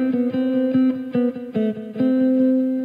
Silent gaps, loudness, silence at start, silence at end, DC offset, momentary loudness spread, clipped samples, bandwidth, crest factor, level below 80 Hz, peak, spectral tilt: none; -20 LUFS; 0 s; 0 s; under 0.1%; 6 LU; under 0.1%; 4.2 kHz; 10 dB; -68 dBFS; -10 dBFS; -9.5 dB/octave